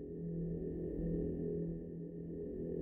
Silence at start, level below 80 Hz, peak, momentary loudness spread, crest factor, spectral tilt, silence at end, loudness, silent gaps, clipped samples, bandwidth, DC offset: 0 s; -52 dBFS; -28 dBFS; 7 LU; 12 dB; -13 dB/octave; 0 s; -42 LUFS; none; under 0.1%; 2 kHz; under 0.1%